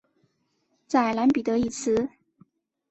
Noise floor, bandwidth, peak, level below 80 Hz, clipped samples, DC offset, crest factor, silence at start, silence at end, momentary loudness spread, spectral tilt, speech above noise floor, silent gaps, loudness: -72 dBFS; 8.2 kHz; -8 dBFS; -58 dBFS; under 0.1%; under 0.1%; 20 dB; 0.9 s; 0.85 s; 5 LU; -5 dB/octave; 49 dB; none; -25 LUFS